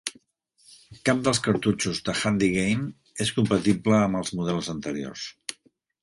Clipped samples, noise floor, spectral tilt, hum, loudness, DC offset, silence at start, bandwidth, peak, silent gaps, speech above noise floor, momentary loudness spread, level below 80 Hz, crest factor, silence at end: under 0.1%; -64 dBFS; -5 dB/octave; none; -25 LUFS; under 0.1%; 0.05 s; 11.5 kHz; -6 dBFS; none; 40 dB; 13 LU; -54 dBFS; 20 dB; 0.5 s